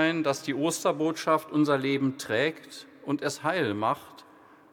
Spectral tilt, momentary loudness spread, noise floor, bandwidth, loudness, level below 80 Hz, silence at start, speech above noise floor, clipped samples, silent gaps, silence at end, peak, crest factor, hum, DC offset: -4.5 dB/octave; 9 LU; -54 dBFS; 18.5 kHz; -28 LUFS; -78 dBFS; 0 s; 27 dB; under 0.1%; none; 0.5 s; -10 dBFS; 18 dB; none; under 0.1%